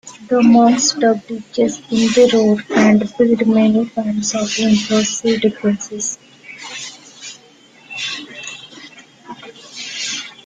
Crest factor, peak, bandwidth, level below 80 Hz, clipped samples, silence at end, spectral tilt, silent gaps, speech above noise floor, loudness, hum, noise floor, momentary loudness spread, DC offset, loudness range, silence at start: 16 dB; -2 dBFS; 9.4 kHz; -56 dBFS; under 0.1%; 0.15 s; -4 dB/octave; none; 32 dB; -15 LUFS; none; -46 dBFS; 22 LU; under 0.1%; 16 LU; 0.05 s